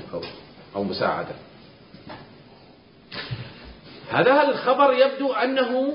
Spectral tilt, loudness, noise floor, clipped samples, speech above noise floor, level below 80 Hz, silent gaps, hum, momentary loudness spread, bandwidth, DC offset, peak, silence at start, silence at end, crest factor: -9.5 dB/octave; -21 LUFS; -51 dBFS; under 0.1%; 29 dB; -58 dBFS; none; none; 24 LU; 5.4 kHz; under 0.1%; -4 dBFS; 0 s; 0 s; 20 dB